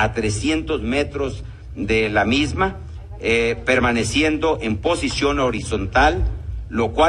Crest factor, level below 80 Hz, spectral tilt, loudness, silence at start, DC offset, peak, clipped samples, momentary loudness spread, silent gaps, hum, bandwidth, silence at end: 18 dB; -32 dBFS; -5 dB/octave; -20 LUFS; 0 s; under 0.1%; 0 dBFS; under 0.1%; 10 LU; none; none; 11 kHz; 0 s